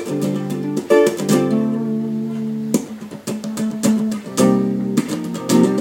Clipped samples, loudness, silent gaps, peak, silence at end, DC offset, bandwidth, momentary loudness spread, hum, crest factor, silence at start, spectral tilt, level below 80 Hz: under 0.1%; -19 LUFS; none; 0 dBFS; 0 s; under 0.1%; 17 kHz; 9 LU; none; 18 dB; 0 s; -6 dB/octave; -62 dBFS